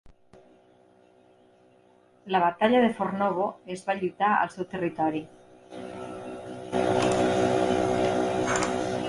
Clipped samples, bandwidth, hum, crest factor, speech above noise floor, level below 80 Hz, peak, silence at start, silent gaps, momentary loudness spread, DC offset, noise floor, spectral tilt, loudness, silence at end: under 0.1%; 11.5 kHz; none; 18 dB; 33 dB; -58 dBFS; -10 dBFS; 0.05 s; none; 16 LU; under 0.1%; -59 dBFS; -5 dB/octave; -26 LUFS; 0 s